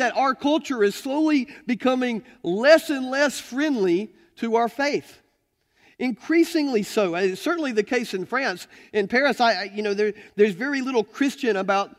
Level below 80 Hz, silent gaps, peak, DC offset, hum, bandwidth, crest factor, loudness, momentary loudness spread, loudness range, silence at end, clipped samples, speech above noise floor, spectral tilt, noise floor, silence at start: -68 dBFS; none; -4 dBFS; under 0.1%; none; 16 kHz; 20 dB; -23 LUFS; 8 LU; 3 LU; 0.1 s; under 0.1%; 47 dB; -4.5 dB/octave; -70 dBFS; 0 s